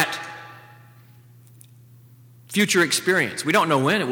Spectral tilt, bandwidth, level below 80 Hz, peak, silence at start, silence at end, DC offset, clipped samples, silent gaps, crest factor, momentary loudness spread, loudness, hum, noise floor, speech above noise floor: -3.5 dB/octave; over 20 kHz; -70 dBFS; -4 dBFS; 0 s; 0 s; under 0.1%; under 0.1%; none; 20 dB; 18 LU; -20 LUFS; none; -49 dBFS; 29 dB